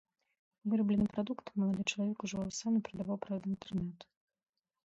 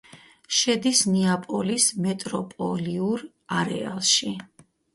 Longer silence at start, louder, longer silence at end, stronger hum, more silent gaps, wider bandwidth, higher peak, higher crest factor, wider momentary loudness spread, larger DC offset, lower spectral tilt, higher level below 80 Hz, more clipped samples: first, 0.65 s vs 0.15 s; second, -36 LUFS vs -23 LUFS; first, 0.8 s vs 0.5 s; neither; neither; second, 8 kHz vs 12 kHz; second, -20 dBFS vs -8 dBFS; about the same, 16 dB vs 18 dB; about the same, 8 LU vs 10 LU; neither; first, -5.5 dB/octave vs -3 dB/octave; about the same, -66 dBFS vs -64 dBFS; neither